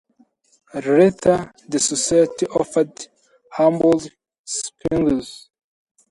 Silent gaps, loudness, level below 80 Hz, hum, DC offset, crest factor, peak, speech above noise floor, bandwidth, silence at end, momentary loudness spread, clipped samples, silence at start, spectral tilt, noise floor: 4.39-4.44 s; -19 LUFS; -52 dBFS; none; under 0.1%; 18 dB; -2 dBFS; 40 dB; 11.5 kHz; 0.75 s; 18 LU; under 0.1%; 0.75 s; -4.5 dB/octave; -58 dBFS